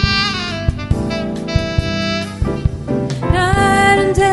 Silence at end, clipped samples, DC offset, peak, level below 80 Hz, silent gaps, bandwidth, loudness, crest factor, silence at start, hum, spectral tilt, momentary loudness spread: 0 s; under 0.1%; under 0.1%; 0 dBFS; -26 dBFS; none; 11.5 kHz; -16 LUFS; 16 dB; 0 s; none; -5.5 dB/octave; 9 LU